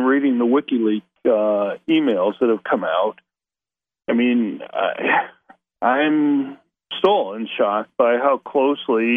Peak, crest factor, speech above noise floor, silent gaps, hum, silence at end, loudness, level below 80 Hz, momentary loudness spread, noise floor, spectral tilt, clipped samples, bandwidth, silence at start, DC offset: -4 dBFS; 16 dB; over 71 dB; none; none; 0 s; -19 LUFS; -72 dBFS; 6 LU; under -90 dBFS; -7.5 dB/octave; under 0.1%; 4.2 kHz; 0 s; under 0.1%